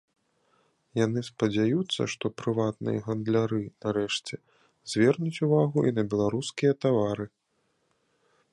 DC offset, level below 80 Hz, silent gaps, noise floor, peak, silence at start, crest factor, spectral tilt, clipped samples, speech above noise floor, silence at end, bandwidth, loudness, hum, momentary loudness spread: under 0.1%; -64 dBFS; none; -73 dBFS; -10 dBFS; 0.95 s; 18 dB; -6 dB/octave; under 0.1%; 47 dB; 1.25 s; 11.5 kHz; -27 LUFS; none; 8 LU